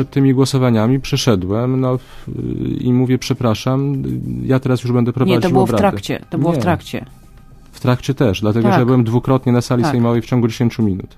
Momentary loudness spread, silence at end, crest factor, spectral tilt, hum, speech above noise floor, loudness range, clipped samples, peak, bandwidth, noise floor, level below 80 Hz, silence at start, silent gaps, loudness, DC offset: 9 LU; 0.1 s; 16 dB; -7 dB/octave; none; 25 dB; 3 LU; under 0.1%; 0 dBFS; 15 kHz; -40 dBFS; -40 dBFS; 0 s; none; -16 LUFS; under 0.1%